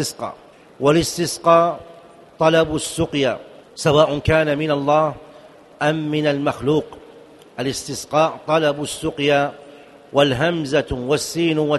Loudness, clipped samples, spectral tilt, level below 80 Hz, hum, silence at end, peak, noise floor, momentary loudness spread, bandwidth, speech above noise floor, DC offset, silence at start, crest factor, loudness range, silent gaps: -19 LUFS; under 0.1%; -5 dB/octave; -44 dBFS; none; 0 s; 0 dBFS; -44 dBFS; 10 LU; 12 kHz; 26 dB; under 0.1%; 0 s; 20 dB; 3 LU; none